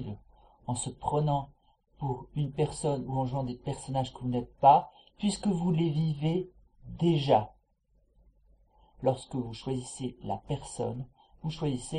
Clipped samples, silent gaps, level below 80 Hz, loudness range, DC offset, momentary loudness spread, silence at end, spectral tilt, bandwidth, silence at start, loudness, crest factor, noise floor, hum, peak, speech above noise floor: under 0.1%; none; -54 dBFS; 8 LU; under 0.1%; 15 LU; 0 s; -6.5 dB/octave; 10.5 kHz; 0 s; -31 LUFS; 22 dB; -69 dBFS; none; -8 dBFS; 40 dB